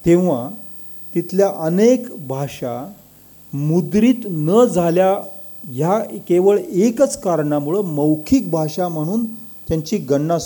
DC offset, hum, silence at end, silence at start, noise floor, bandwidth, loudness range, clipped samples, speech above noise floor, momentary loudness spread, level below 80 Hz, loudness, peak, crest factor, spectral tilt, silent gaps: under 0.1%; 50 Hz at -45 dBFS; 0 s; 0 s; -44 dBFS; 19 kHz; 3 LU; under 0.1%; 28 dB; 14 LU; -48 dBFS; -18 LUFS; -4 dBFS; 14 dB; -7 dB/octave; none